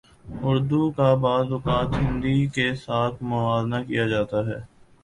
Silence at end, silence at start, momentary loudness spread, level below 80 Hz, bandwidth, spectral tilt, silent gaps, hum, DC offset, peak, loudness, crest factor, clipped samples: 0.4 s; 0.25 s; 6 LU; -42 dBFS; 11 kHz; -7.5 dB/octave; none; none; under 0.1%; -6 dBFS; -24 LUFS; 18 dB; under 0.1%